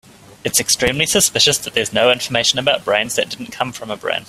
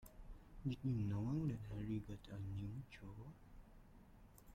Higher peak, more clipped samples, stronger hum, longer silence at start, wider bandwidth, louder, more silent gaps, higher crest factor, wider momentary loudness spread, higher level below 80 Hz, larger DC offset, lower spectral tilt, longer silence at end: first, 0 dBFS vs -32 dBFS; neither; neither; first, 0.45 s vs 0 s; about the same, 16 kHz vs 16 kHz; first, -16 LUFS vs -46 LUFS; neither; about the same, 18 dB vs 16 dB; second, 11 LU vs 24 LU; first, -48 dBFS vs -60 dBFS; neither; second, -1.5 dB/octave vs -8.5 dB/octave; about the same, 0.05 s vs 0 s